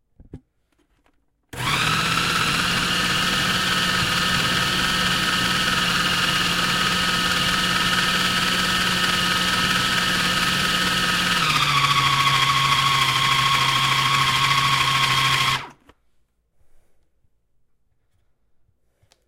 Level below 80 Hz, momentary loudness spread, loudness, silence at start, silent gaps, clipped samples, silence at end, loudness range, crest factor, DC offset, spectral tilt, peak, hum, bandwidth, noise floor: -44 dBFS; 2 LU; -18 LUFS; 0.35 s; none; under 0.1%; 3.55 s; 4 LU; 16 dB; under 0.1%; -2 dB/octave; -6 dBFS; none; 16 kHz; -66 dBFS